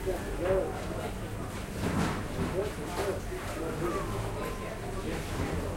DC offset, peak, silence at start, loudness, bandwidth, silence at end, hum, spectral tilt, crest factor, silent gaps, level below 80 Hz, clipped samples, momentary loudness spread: under 0.1%; -16 dBFS; 0 s; -34 LUFS; 16 kHz; 0 s; none; -5.5 dB/octave; 16 dB; none; -42 dBFS; under 0.1%; 7 LU